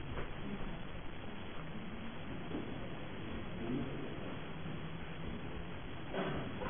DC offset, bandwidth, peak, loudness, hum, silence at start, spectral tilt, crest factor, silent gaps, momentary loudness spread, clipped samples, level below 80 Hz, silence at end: 0.5%; 3.6 kHz; -26 dBFS; -45 LUFS; none; 0 s; -4.5 dB/octave; 18 dB; none; 7 LU; under 0.1%; -52 dBFS; 0 s